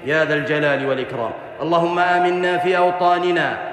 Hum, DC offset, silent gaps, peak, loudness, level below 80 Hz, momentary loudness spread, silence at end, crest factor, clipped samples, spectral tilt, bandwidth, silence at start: none; under 0.1%; none; -4 dBFS; -18 LUFS; -62 dBFS; 8 LU; 0 s; 14 dB; under 0.1%; -6 dB/octave; 9.8 kHz; 0 s